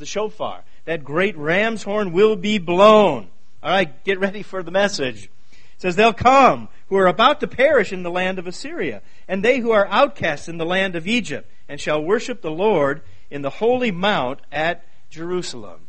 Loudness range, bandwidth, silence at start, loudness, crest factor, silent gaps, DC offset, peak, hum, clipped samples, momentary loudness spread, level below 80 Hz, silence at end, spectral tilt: 5 LU; 8.8 kHz; 0 s; -19 LUFS; 20 dB; none; 3%; 0 dBFS; none; under 0.1%; 16 LU; -50 dBFS; 0.15 s; -5 dB/octave